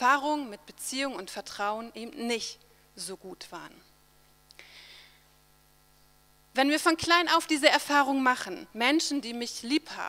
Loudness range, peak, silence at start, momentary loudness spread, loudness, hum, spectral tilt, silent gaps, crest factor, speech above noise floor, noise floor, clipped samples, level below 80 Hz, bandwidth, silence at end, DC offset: 20 LU; -4 dBFS; 0 s; 20 LU; -27 LUFS; none; -2 dB/octave; none; 26 dB; 34 dB; -62 dBFS; under 0.1%; -68 dBFS; 16.5 kHz; 0 s; under 0.1%